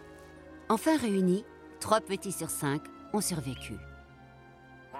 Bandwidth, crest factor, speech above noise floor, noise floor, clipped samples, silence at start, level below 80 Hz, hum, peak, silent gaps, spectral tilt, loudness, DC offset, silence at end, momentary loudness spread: 16 kHz; 22 dB; 23 dB; -54 dBFS; under 0.1%; 0 s; -58 dBFS; none; -10 dBFS; none; -5 dB/octave; -31 LUFS; under 0.1%; 0 s; 23 LU